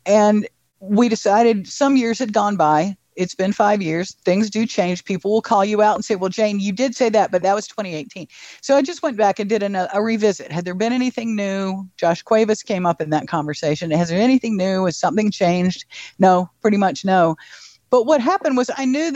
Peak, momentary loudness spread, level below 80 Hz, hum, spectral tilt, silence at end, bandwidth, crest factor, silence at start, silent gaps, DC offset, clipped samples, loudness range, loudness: -2 dBFS; 8 LU; -62 dBFS; none; -5.5 dB/octave; 0 s; 8.4 kHz; 16 dB; 0.05 s; none; under 0.1%; under 0.1%; 2 LU; -19 LUFS